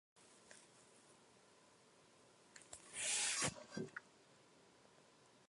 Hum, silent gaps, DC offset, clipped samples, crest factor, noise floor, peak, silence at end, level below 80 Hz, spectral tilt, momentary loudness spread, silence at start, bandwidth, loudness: none; none; under 0.1%; under 0.1%; 24 dB; -69 dBFS; -28 dBFS; 1.4 s; -80 dBFS; -1 dB/octave; 28 LU; 0.2 s; 12 kHz; -42 LUFS